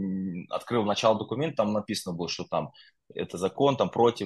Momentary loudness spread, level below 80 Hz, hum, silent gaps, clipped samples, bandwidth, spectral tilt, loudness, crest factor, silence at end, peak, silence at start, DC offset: 11 LU; -66 dBFS; none; none; under 0.1%; 12.5 kHz; -5.5 dB/octave; -28 LUFS; 20 dB; 0 s; -8 dBFS; 0 s; under 0.1%